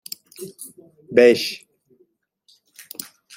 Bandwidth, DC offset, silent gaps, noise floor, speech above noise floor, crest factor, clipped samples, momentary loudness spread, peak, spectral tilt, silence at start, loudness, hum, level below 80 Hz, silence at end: 16.5 kHz; under 0.1%; none; -63 dBFS; 44 dB; 22 dB; under 0.1%; 24 LU; -2 dBFS; -3.5 dB/octave; 0.4 s; -17 LUFS; none; -70 dBFS; 1.8 s